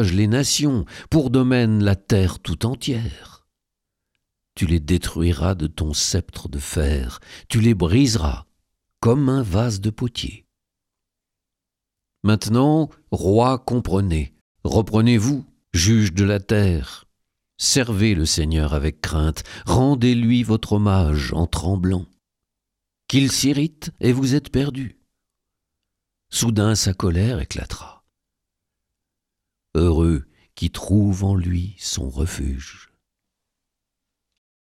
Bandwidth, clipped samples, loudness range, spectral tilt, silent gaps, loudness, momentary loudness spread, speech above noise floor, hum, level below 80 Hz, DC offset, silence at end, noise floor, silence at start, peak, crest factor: 15.5 kHz; under 0.1%; 5 LU; -5.5 dB/octave; 14.41-14.55 s; -20 LUFS; 10 LU; 65 dB; none; -34 dBFS; under 0.1%; 1.95 s; -84 dBFS; 0 s; -4 dBFS; 16 dB